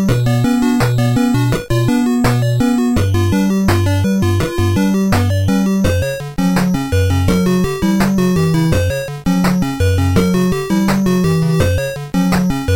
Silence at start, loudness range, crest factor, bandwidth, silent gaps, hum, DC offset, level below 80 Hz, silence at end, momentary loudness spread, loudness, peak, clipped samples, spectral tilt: 0 s; 1 LU; 12 dB; 17 kHz; none; none; under 0.1%; -30 dBFS; 0 s; 2 LU; -15 LUFS; 0 dBFS; under 0.1%; -6.5 dB/octave